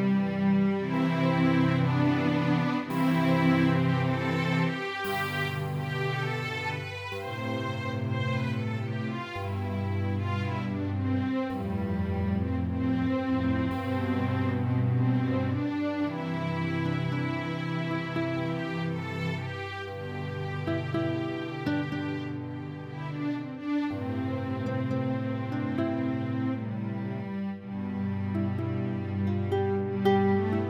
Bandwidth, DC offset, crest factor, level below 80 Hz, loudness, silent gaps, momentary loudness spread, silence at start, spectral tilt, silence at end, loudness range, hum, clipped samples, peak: over 20 kHz; under 0.1%; 16 dB; -56 dBFS; -29 LUFS; none; 9 LU; 0 s; -8 dB/octave; 0 s; 7 LU; none; under 0.1%; -12 dBFS